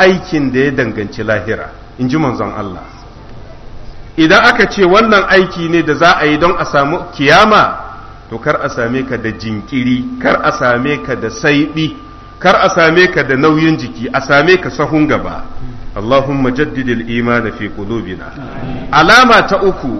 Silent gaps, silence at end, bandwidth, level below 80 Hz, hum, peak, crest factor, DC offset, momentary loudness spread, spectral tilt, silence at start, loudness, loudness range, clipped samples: none; 0 s; 13 kHz; -34 dBFS; none; 0 dBFS; 12 dB; under 0.1%; 16 LU; -5.5 dB/octave; 0 s; -11 LUFS; 7 LU; 0.2%